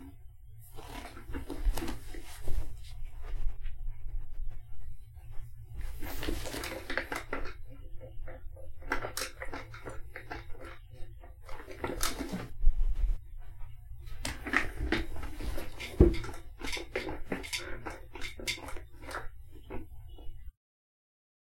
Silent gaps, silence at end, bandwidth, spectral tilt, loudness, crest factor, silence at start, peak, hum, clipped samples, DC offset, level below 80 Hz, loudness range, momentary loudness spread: none; 1 s; 16.5 kHz; -4.5 dB/octave; -38 LUFS; 26 dB; 0 s; -8 dBFS; none; under 0.1%; under 0.1%; -38 dBFS; 11 LU; 17 LU